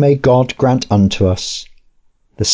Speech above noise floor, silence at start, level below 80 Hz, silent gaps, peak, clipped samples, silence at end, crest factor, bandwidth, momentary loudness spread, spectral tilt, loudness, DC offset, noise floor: 41 dB; 0 s; -34 dBFS; none; -2 dBFS; under 0.1%; 0 s; 12 dB; 8 kHz; 9 LU; -5.5 dB/octave; -14 LUFS; under 0.1%; -53 dBFS